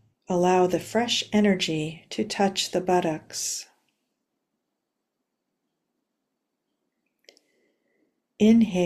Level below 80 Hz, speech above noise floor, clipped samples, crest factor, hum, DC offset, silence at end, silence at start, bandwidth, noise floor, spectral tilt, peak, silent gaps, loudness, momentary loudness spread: -64 dBFS; 58 dB; under 0.1%; 18 dB; none; under 0.1%; 0 s; 0.3 s; 14.5 kHz; -81 dBFS; -4.5 dB/octave; -8 dBFS; none; -24 LUFS; 10 LU